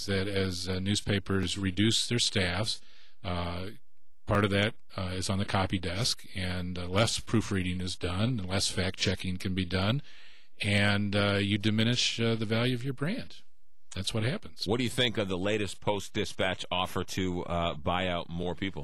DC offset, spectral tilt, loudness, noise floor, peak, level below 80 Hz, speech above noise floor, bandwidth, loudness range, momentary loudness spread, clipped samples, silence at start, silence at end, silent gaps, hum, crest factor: 1%; -4.5 dB/octave; -30 LUFS; -54 dBFS; -14 dBFS; -52 dBFS; 23 dB; 13 kHz; 3 LU; 8 LU; under 0.1%; 0 s; 0 s; none; none; 16 dB